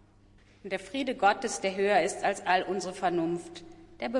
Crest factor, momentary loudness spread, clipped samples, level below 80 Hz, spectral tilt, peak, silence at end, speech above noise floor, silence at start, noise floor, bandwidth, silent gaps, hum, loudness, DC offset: 20 dB; 12 LU; under 0.1%; -62 dBFS; -4 dB/octave; -12 dBFS; 0 s; 30 dB; 0.65 s; -59 dBFS; 11.5 kHz; none; none; -29 LUFS; under 0.1%